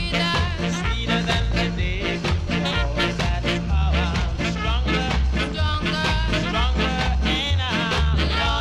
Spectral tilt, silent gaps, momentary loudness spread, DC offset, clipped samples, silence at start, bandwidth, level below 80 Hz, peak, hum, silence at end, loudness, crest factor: -5 dB/octave; none; 3 LU; under 0.1%; under 0.1%; 0 s; 10.5 kHz; -26 dBFS; -6 dBFS; none; 0 s; -22 LUFS; 14 dB